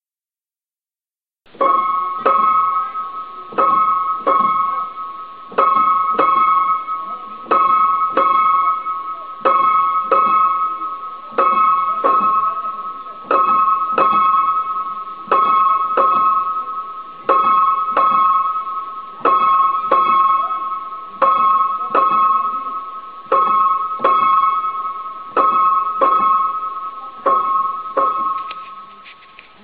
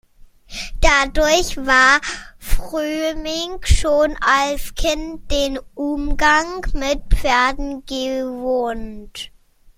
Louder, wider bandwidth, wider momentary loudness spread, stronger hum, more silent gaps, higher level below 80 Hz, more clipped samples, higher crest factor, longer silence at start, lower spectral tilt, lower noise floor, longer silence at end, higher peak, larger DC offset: about the same, -16 LUFS vs -18 LUFS; second, 4.9 kHz vs 16 kHz; about the same, 13 LU vs 15 LU; neither; neither; second, -66 dBFS vs -26 dBFS; neither; about the same, 16 dB vs 18 dB; first, 1.6 s vs 0.5 s; first, -8.5 dB/octave vs -3.5 dB/octave; first, under -90 dBFS vs -44 dBFS; about the same, 0.5 s vs 0.5 s; about the same, 0 dBFS vs 0 dBFS; first, 0.4% vs under 0.1%